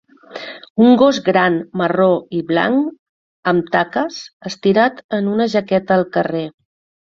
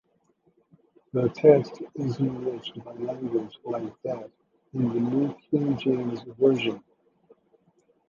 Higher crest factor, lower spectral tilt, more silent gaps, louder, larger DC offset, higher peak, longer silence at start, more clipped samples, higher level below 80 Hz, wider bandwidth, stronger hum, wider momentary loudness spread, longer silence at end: second, 16 dB vs 24 dB; second, -6.5 dB/octave vs -8.5 dB/octave; first, 0.70-0.75 s, 2.99-3.43 s, 4.33-4.40 s, 5.04-5.09 s vs none; first, -16 LUFS vs -26 LUFS; neither; first, 0 dBFS vs -4 dBFS; second, 0.3 s vs 1.15 s; neither; first, -58 dBFS vs -66 dBFS; about the same, 7.4 kHz vs 7.2 kHz; neither; about the same, 16 LU vs 16 LU; second, 0.5 s vs 1.3 s